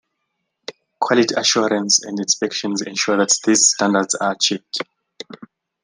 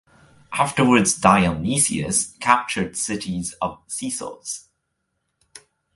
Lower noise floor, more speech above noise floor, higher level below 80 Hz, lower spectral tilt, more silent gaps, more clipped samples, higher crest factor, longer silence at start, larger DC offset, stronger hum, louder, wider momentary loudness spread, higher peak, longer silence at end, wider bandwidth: about the same, -75 dBFS vs -75 dBFS; about the same, 57 dB vs 54 dB; second, -68 dBFS vs -48 dBFS; second, -2 dB/octave vs -3.5 dB/octave; neither; neither; about the same, 18 dB vs 22 dB; first, 0.7 s vs 0.5 s; neither; neither; first, -17 LUFS vs -20 LUFS; first, 23 LU vs 14 LU; about the same, -2 dBFS vs 0 dBFS; about the same, 0.4 s vs 0.35 s; about the same, 11 kHz vs 12 kHz